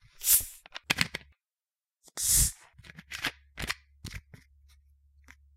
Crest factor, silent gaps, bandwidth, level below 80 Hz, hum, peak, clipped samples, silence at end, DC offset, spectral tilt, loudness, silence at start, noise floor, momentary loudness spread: 28 dB; none; 16 kHz; -46 dBFS; none; -6 dBFS; under 0.1%; 1.35 s; under 0.1%; -0.5 dB/octave; -27 LUFS; 0.2 s; under -90 dBFS; 22 LU